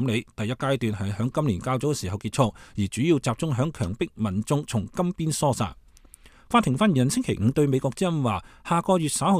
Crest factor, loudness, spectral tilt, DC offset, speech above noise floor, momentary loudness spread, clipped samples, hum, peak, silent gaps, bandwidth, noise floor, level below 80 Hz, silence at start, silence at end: 18 dB; -25 LUFS; -6 dB/octave; under 0.1%; 27 dB; 7 LU; under 0.1%; none; -6 dBFS; none; 15.5 kHz; -51 dBFS; -50 dBFS; 0 s; 0 s